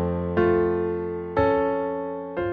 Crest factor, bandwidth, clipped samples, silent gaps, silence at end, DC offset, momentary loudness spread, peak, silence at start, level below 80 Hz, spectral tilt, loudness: 14 dB; 4.9 kHz; under 0.1%; none; 0 s; under 0.1%; 8 LU; -8 dBFS; 0 s; -46 dBFS; -10 dB/octave; -24 LUFS